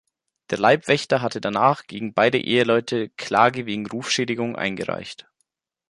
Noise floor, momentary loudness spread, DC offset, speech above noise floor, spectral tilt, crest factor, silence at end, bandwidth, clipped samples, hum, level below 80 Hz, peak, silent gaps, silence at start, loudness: -74 dBFS; 10 LU; under 0.1%; 52 dB; -4.5 dB/octave; 20 dB; 0.7 s; 11.5 kHz; under 0.1%; none; -62 dBFS; -2 dBFS; none; 0.5 s; -21 LUFS